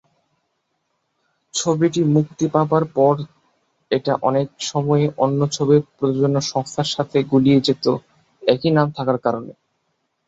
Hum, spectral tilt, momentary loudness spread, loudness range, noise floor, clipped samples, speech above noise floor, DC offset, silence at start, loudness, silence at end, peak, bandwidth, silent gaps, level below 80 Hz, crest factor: none; -6 dB/octave; 7 LU; 2 LU; -72 dBFS; under 0.1%; 54 dB; under 0.1%; 1.55 s; -19 LUFS; 0.75 s; -2 dBFS; 8 kHz; none; -60 dBFS; 18 dB